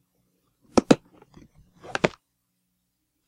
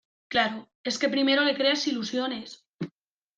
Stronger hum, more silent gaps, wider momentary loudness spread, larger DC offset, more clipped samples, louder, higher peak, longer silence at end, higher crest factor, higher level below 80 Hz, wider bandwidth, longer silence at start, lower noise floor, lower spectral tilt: first, 60 Hz at -55 dBFS vs none; second, none vs 0.75-0.84 s, 2.69-2.78 s; second, 7 LU vs 17 LU; neither; neither; about the same, -24 LUFS vs -26 LUFS; first, 0 dBFS vs -8 dBFS; first, 1.2 s vs 0.5 s; first, 28 dB vs 20 dB; first, -54 dBFS vs -70 dBFS; first, 12 kHz vs 9 kHz; first, 0.75 s vs 0.3 s; first, -76 dBFS vs -63 dBFS; first, -5 dB/octave vs -3.5 dB/octave